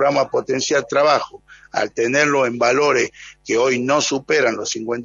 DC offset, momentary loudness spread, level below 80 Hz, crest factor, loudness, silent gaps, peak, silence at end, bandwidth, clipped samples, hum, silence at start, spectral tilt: under 0.1%; 8 LU; -60 dBFS; 16 dB; -18 LUFS; none; -2 dBFS; 0 s; 7.6 kHz; under 0.1%; none; 0 s; -3 dB/octave